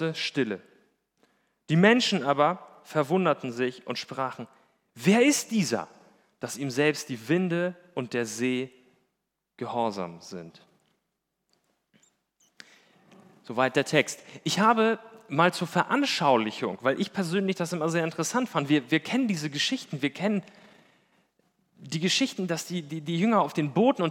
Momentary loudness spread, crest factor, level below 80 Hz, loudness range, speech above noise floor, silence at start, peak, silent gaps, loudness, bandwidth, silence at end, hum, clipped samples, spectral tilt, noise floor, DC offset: 12 LU; 22 dB; -84 dBFS; 9 LU; 55 dB; 0 s; -4 dBFS; none; -26 LUFS; 17.5 kHz; 0 s; none; under 0.1%; -4.5 dB/octave; -81 dBFS; under 0.1%